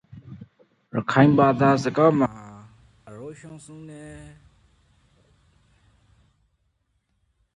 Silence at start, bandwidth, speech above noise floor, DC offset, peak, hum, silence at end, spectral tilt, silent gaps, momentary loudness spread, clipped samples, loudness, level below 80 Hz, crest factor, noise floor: 0.3 s; 10.5 kHz; 51 dB; under 0.1%; -2 dBFS; none; 3.4 s; -7.5 dB/octave; none; 27 LU; under 0.1%; -20 LUFS; -58 dBFS; 24 dB; -71 dBFS